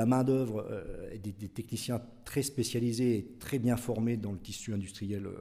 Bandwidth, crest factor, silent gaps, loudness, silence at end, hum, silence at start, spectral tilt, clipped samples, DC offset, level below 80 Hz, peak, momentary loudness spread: 16 kHz; 18 dB; none; -34 LUFS; 0 s; none; 0 s; -6 dB/octave; under 0.1%; under 0.1%; -56 dBFS; -14 dBFS; 11 LU